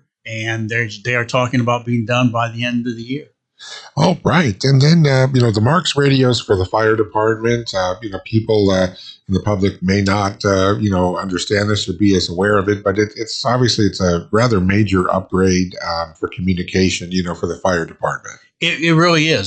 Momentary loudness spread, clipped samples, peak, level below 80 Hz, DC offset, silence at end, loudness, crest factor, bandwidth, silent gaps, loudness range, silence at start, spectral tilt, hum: 9 LU; under 0.1%; -2 dBFS; -48 dBFS; under 0.1%; 0 s; -16 LUFS; 14 dB; 9 kHz; none; 4 LU; 0.25 s; -5.5 dB/octave; none